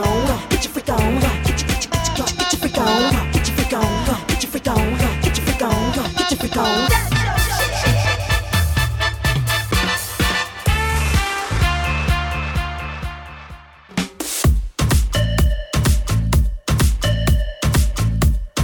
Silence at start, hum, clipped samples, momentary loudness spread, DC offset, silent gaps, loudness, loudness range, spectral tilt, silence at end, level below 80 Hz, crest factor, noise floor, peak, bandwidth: 0 s; none; under 0.1%; 4 LU; under 0.1%; none; -19 LUFS; 3 LU; -4.5 dB/octave; 0 s; -22 dBFS; 16 dB; -39 dBFS; -2 dBFS; 19 kHz